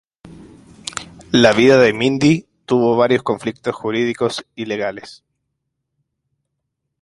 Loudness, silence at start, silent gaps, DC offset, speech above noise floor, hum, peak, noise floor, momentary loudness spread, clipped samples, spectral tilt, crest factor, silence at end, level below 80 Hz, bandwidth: -16 LUFS; 0.25 s; none; under 0.1%; 60 dB; none; 0 dBFS; -76 dBFS; 17 LU; under 0.1%; -5.5 dB/octave; 18 dB; 1.85 s; -54 dBFS; 11.5 kHz